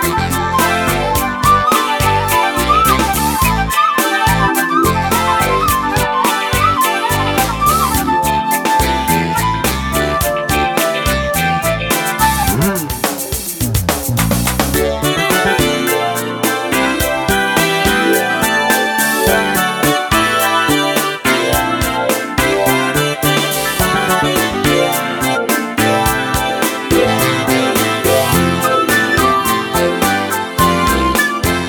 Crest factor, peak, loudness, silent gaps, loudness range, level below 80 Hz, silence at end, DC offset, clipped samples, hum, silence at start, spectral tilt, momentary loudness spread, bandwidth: 14 dB; 0 dBFS; -13 LUFS; none; 2 LU; -30 dBFS; 0 s; under 0.1%; under 0.1%; none; 0 s; -3.5 dB/octave; 4 LU; over 20 kHz